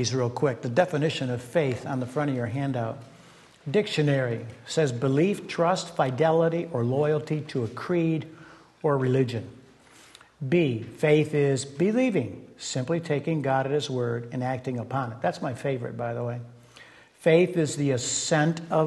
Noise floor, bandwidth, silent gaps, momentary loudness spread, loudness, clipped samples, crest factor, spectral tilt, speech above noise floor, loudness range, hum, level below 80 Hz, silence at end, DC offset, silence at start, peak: -53 dBFS; 12 kHz; none; 9 LU; -26 LUFS; under 0.1%; 20 dB; -5.5 dB/octave; 28 dB; 4 LU; none; -66 dBFS; 0 s; under 0.1%; 0 s; -8 dBFS